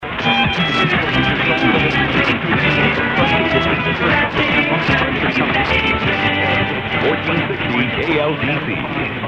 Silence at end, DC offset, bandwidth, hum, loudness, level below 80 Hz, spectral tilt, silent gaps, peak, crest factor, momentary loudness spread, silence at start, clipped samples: 0 s; under 0.1%; 9 kHz; none; -15 LUFS; -36 dBFS; -6.5 dB/octave; none; -2 dBFS; 16 dB; 4 LU; 0 s; under 0.1%